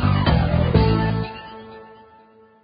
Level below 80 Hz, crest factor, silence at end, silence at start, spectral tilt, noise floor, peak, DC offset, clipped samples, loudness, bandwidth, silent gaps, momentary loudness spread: -28 dBFS; 18 dB; 0.8 s; 0 s; -12 dB/octave; -51 dBFS; -4 dBFS; under 0.1%; under 0.1%; -19 LUFS; 5.2 kHz; none; 21 LU